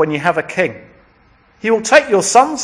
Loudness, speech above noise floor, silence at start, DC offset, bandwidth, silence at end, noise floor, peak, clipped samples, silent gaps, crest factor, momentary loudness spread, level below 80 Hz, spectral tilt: -14 LUFS; 37 dB; 0 s; under 0.1%; 10.5 kHz; 0 s; -51 dBFS; 0 dBFS; 0.2%; none; 16 dB; 8 LU; -56 dBFS; -3 dB/octave